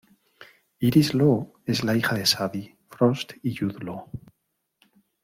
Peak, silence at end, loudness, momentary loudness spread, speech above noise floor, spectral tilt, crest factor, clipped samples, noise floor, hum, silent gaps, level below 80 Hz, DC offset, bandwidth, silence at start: -6 dBFS; 1.05 s; -24 LUFS; 17 LU; 54 dB; -5.5 dB/octave; 20 dB; under 0.1%; -77 dBFS; none; none; -60 dBFS; under 0.1%; 16.5 kHz; 0.4 s